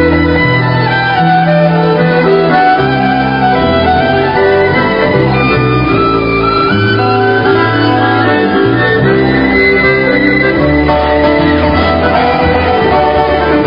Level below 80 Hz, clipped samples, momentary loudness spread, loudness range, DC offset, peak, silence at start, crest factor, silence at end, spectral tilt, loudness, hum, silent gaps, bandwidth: -28 dBFS; 0.2%; 2 LU; 1 LU; 0.5%; 0 dBFS; 0 s; 8 dB; 0 s; -9 dB/octave; -9 LUFS; none; none; 5.4 kHz